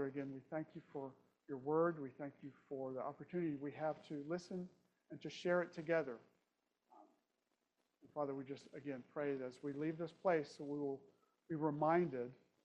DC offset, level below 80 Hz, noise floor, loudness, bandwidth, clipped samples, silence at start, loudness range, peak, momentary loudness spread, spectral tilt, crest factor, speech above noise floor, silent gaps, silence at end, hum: under 0.1%; -86 dBFS; -87 dBFS; -43 LUFS; 9 kHz; under 0.1%; 0 s; 6 LU; -24 dBFS; 14 LU; -7.5 dB/octave; 20 dB; 44 dB; none; 0.3 s; none